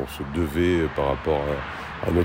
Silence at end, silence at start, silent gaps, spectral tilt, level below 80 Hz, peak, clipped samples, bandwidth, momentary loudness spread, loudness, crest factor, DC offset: 0 s; 0 s; none; -7 dB/octave; -40 dBFS; -8 dBFS; under 0.1%; 16 kHz; 8 LU; -25 LUFS; 16 dB; under 0.1%